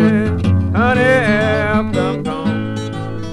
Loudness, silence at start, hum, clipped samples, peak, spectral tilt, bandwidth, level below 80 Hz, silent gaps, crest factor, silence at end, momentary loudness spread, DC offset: -16 LUFS; 0 s; none; under 0.1%; 0 dBFS; -7 dB/octave; 11 kHz; -36 dBFS; none; 14 dB; 0 s; 10 LU; under 0.1%